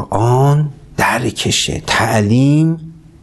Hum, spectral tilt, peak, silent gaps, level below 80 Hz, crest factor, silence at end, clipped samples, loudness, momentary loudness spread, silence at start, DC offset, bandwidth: none; -5 dB/octave; 0 dBFS; none; -38 dBFS; 14 dB; 0.3 s; under 0.1%; -14 LUFS; 5 LU; 0 s; under 0.1%; 12.5 kHz